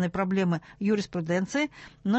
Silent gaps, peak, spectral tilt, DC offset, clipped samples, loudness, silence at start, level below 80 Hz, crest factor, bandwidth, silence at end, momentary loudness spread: none; -12 dBFS; -6.5 dB/octave; under 0.1%; under 0.1%; -28 LUFS; 0 s; -60 dBFS; 14 dB; 8.4 kHz; 0 s; 4 LU